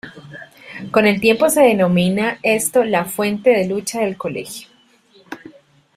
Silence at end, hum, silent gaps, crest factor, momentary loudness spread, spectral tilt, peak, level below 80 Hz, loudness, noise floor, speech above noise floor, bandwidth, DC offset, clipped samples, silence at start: 0.6 s; none; none; 16 dB; 23 LU; -4.5 dB/octave; -2 dBFS; -58 dBFS; -16 LUFS; -52 dBFS; 36 dB; 16 kHz; under 0.1%; under 0.1%; 0.05 s